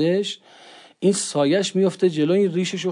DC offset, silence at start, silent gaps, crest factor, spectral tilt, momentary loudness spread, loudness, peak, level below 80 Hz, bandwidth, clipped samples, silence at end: under 0.1%; 0 s; none; 14 dB; -5 dB/octave; 5 LU; -21 LUFS; -8 dBFS; -78 dBFS; 11 kHz; under 0.1%; 0 s